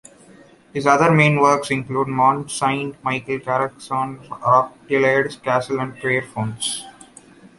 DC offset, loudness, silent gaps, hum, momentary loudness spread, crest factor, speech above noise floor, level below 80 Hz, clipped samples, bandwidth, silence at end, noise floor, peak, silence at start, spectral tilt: under 0.1%; -19 LUFS; none; none; 11 LU; 18 dB; 29 dB; -58 dBFS; under 0.1%; 11.5 kHz; 0.7 s; -48 dBFS; -2 dBFS; 0.75 s; -5 dB/octave